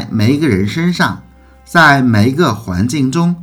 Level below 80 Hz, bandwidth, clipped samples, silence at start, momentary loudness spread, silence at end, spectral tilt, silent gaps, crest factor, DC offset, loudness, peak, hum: -44 dBFS; 16.5 kHz; 0.4%; 0 s; 8 LU; 0 s; -6 dB/octave; none; 12 dB; under 0.1%; -12 LUFS; 0 dBFS; none